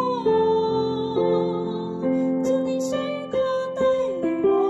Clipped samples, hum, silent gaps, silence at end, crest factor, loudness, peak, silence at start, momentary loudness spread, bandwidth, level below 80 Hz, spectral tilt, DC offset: under 0.1%; none; none; 0 s; 12 dB; -23 LUFS; -10 dBFS; 0 s; 6 LU; 12.5 kHz; -58 dBFS; -6.5 dB/octave; under 0.1%